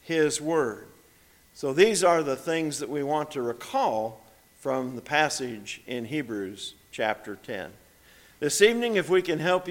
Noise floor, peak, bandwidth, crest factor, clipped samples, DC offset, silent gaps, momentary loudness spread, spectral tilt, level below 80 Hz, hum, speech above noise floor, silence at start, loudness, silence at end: -58 dBFS; -6 dBFS; 17.5 kHz; 22 dB; under 0.1%; under 0.1%; none; 15 LU; -3.5 dB/octave; -66 dBFS; none; 32 dB; 0.05 s; -26 LUFS; 0 s